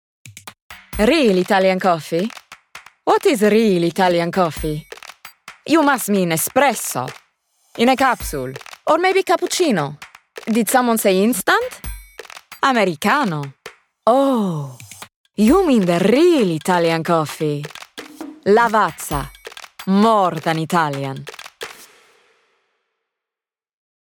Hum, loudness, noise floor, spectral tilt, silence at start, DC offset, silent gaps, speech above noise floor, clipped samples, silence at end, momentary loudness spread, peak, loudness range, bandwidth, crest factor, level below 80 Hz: none; -17 LUFS; -89 dBFS; -5 dB/octave; 0.25 s; under 0.1%; 0.62-0.70 s, 15.16-15.24 s; 73 dB; under 0.1%; 2.25 s; 21 LU; -2 dBFS; 4 LU; over 20 kHz; 16 dB; -44 dBFS